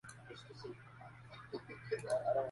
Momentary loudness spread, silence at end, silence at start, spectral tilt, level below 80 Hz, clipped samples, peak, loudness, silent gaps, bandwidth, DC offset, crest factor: 18 LU; 0 s; 0.05 s; -5 dB/octave; -72 dBFS; under 0.1%; -26 dBFS; -43 LUFS; none; 11.5 kHz; under 0.1%; 18 dB